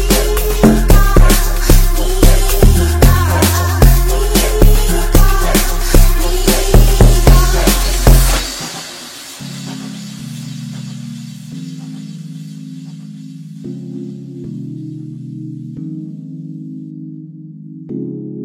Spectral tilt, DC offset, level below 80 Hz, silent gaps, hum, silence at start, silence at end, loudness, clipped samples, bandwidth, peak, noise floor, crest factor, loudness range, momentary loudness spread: -5 dB/octave; under 0.1%; -14 dBFS; none; none; 0 s; 0 s; -12 LUFS; 0.1%; 17 kHz; 0 dBFS; -32 dBFS; 12 dB; 16 LU; 18 LU